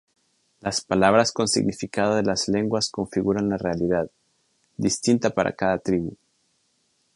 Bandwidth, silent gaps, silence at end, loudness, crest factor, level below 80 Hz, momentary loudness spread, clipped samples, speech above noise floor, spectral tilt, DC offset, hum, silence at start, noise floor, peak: 11.5 kHz; none; 1 s; -23 LUFS; 22 dB; -52 dBFS; 8 LU; under 0.1%; 46 dB; -4.5 dB/octave; under 0.1%; none; 0.65 s; -69 dBFS; -2 dBFS